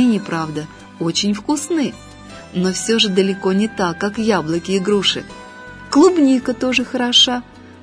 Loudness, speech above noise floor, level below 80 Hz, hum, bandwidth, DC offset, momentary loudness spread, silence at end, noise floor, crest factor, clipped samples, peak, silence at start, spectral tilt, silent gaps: -17 LUFS; 19 dB; -50 dBFS; none; 11 kHz; under 0.1%; 21 LU; 0.1 s; -36 dBFS; 16 dB; under 0.1%; -2 dBFS; 0 s; -4 dB/octave; none